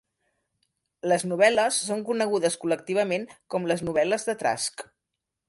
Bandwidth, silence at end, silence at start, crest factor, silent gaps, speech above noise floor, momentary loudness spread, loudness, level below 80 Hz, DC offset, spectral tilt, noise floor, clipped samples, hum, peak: 11.5 kHz; 0.65 s; 1.05 s; 20 dB; none; 59 dB; 10 LU; -25 LUFS; -66 dBFS; under 0.1%; -3.5 dB/octave; -85 dBFS; under 0.1%; none; -8 dBFS